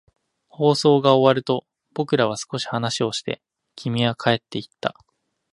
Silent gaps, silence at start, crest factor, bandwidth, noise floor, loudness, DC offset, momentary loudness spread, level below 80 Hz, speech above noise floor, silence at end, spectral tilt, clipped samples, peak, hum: none; 0.6 s; 22 dB; 11.5 kHz; -67 dBFS; -21 LUFS; under 0.1%; 14 LU; -62 dBFS; 47 dB; 0.6 s; -5.5 dB/octave; under 0.1%; -2 dBFS; none